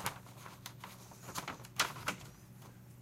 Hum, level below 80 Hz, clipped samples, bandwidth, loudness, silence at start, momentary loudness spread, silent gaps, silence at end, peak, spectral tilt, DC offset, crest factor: none; -68 dBFS; under 0.1%; 16.5 kHz; -42 LUFS; 0 s; 19 LU; none; 0 s; -16 dBFS; -2 dB/octave; under 0.1%; 28 dB